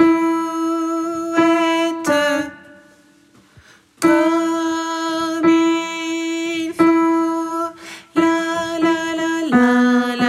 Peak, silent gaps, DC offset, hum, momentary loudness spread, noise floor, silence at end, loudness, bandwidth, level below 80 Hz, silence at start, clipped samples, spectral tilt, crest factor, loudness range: -2 dBFS; none; under 0.1%; none; 8 LU; -51 dBFS; 0 s; -18 LUFS; 13 kHz; -62 dBFS; 0 s; under 0.1%; -4 dB/octave; 16 dB; 3 LU